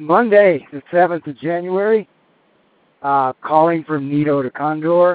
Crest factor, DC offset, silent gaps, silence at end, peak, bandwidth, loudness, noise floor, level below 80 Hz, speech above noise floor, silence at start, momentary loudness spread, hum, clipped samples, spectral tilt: 16 dB; under 0.1%; none; 0 s; 0 dBFS; 4.7 kHz; -17 LUFS; -58 dBFS; -66 dBFS; 42 dB; 0 s; 10 LU; none; under 0.1%; -6 dB/octave